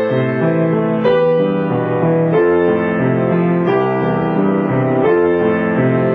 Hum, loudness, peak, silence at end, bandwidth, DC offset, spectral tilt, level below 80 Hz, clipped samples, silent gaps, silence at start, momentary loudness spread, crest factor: none; -15 LUFS; -2 dBFS; 0 s; 4.9 kHz; under 0.1%; -10.5 dB/octave; -50 dBFS; under 0.1%; none; 0 s; 3 LU; 12 dB